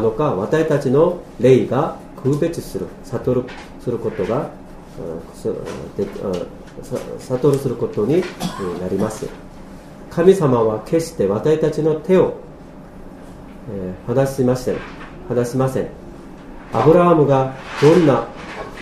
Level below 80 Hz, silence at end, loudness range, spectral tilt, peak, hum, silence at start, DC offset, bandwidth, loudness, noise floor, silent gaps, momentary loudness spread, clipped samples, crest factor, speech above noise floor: -42 dBFS; 0 s; 8 LU; -7.5 dB/octave; 0 dBFS; none; 0 s; under 0.1%; 15 kHz; -18 LUFS; -37 dBFS; none; 24 LU; under 0.1%; 18 dB; 20 dB